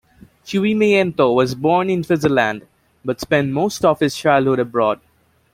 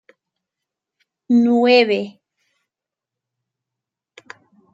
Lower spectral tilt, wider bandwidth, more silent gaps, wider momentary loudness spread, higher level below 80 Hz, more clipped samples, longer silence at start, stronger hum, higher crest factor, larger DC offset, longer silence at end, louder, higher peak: about the same, -6 dB/octave vs -6 dB/octave; first, 16 kHz vs 7.6 kHz; neither; about the same, 10 LU vs 10 LU; first, -52 dBFS vs -72 dBFS; neither; second, 0.45 s vs 1.3 s; neither; about the same, 16 dB vs 18 dB; neither; second, 0.6 s vs 2.65 s; about the same, -17 LUFS vs -15 LUFS; about the same, -2 dBFS vs -4 dBFS